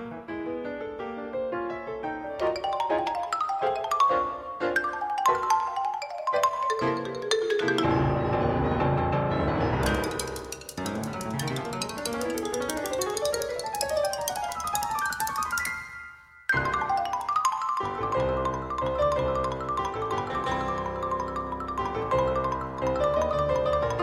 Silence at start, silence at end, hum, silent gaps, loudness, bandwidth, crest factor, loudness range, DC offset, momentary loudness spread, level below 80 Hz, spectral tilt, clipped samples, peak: 0 s; 0 s; none; none; -28 LUFS; 16 kHz; 20 dB; 4 LU; under 0.1%; 8 LU; -44 dBFS; -4.5 dB/octave; under 0.1%; -8 dBFS